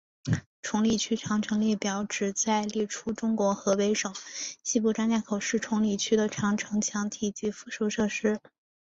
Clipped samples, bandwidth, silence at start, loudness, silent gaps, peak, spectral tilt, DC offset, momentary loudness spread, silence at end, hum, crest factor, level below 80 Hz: under 0.1%; 8 kHz; 0.25 s; -28 LUFS; 0.46-0.63 s; -12 dBFS; -4 dB/octave; under 0.1%; 6 LU; 0.45 s; none; 16 dB; -60 dBFS